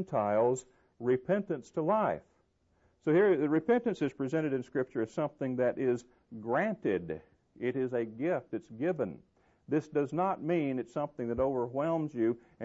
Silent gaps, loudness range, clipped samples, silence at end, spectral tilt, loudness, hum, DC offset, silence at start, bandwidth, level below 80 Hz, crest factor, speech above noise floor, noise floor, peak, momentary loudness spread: none; 4 LU; under 0.1%; 0 s; -7.5 dB/octave; -32 LUFS; none; under 0.1%; 0 s; 8 kHz; -66 dBFS; 14 dB; 40 dB; -72 dBFS; -18 dBFS; 9 LU